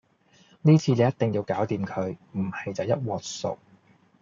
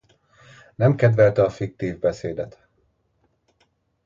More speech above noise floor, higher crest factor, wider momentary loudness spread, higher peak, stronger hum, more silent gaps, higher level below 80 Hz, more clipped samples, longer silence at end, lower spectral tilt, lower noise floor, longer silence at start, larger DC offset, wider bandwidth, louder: second, 35 dB vs 48 dB; about the same, 18 dB vs 20 dB; about the same, 12 LU vs 14 LU; second, -8 dBFS vs -4 dBFS; neither; neither; second, -68 dBFS vs -54 dBFS; neither; second, 0.65 s vs 1.55 s; second, -7 dB/octave vs -8.5 dB/octave; second, -60 dBFS vs -68 dBFS; second, 0.65 s vs 0.8 s; neither; about the same, 7.6 kHz vs 7.4 kHz; second, -26 LUFS vs -21 LUFS